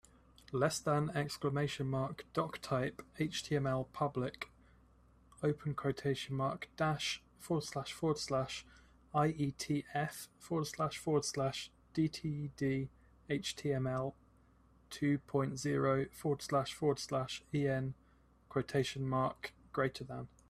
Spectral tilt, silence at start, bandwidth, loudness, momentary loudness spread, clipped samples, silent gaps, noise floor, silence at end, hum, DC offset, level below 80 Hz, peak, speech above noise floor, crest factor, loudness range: -5.5 dB/octave; 0.5 s; 14.5 kHz; -37 LUFS; 8 LU; under 0.1%; none; -67 dBFS; 0.2 s; none; under 0.1%; -64 dBFS; -18 dBFS; 30 dB; 18 dB; 3 LU